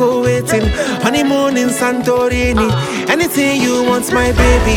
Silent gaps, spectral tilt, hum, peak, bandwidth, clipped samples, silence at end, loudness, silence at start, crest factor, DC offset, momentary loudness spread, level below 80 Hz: none; -5 dB/octave; none; 0 dBFS; 18 kHz; under 0.1%; 0 s; -13 LUFS; 0 s; 12 dB; under 0.1%; 3 LU; -22 dBFS